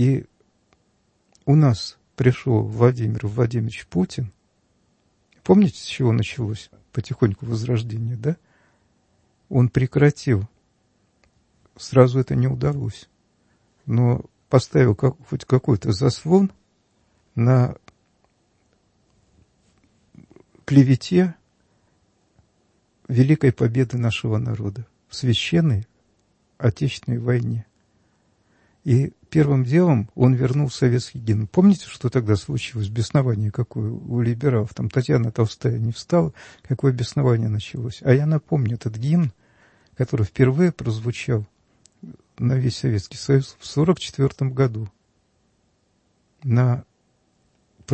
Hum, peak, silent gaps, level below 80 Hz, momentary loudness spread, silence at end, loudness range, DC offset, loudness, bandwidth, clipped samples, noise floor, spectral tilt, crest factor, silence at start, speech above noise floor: none; 0 dBFS; none; -52 dBFS; 11 LU; 0 s; 5 LU; under 0.1%; -21 LUFS; 8.6 kHz; under 0.1%; -66 dBFS; -7.5 dB/octave; 20 dB; 0 s; 46 dB